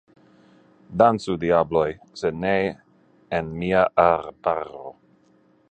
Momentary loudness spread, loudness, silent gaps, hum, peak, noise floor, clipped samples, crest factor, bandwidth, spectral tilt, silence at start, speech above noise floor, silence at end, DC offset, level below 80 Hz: 15 LU; -22 LUFS; none; none; -2 dBFS; -59 dBFS; under 0.1%; 22 dB; 9.2 kHz; -7 dB/octave; 0.9 s; 38 dB; 0.8 s; under 0.1%; -52 dBFS